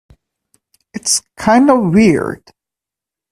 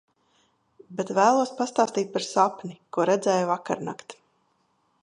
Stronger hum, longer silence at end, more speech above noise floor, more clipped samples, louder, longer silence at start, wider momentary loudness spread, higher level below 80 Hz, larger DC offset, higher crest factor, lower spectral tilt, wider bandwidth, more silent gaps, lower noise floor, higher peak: neither; about the same, 0.95 s vs 0.9 s; first, 75 dB vs 45 dB; neither; first, -13 LUFS vs -25 LUFS; about the same, 0.95 s vs 0.9 s; about the same, 16 LU vs 15 LU; first, -46 dBFS vs -76 dBFS; neither; about the same, 16 dB vs 20 dB; about the same, -4.5 dB/octave vs -4.5 dB/octave; first, 14.5 kHz vs 11 kHz; neither; first, -86 dBFS vs -69 dBFS; first, 0 dBFS vs -6 dBFS